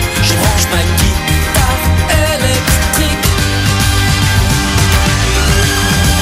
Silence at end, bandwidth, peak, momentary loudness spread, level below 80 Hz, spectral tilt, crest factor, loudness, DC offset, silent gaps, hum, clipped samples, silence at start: 0 s; 16.5 kHz; 0 dBFS; 2 LU; -18 dBFS; -3.5 dB/octave; 10 dB; -11 LUFS; under 0.1%; none; none; under 0.1%; 0 s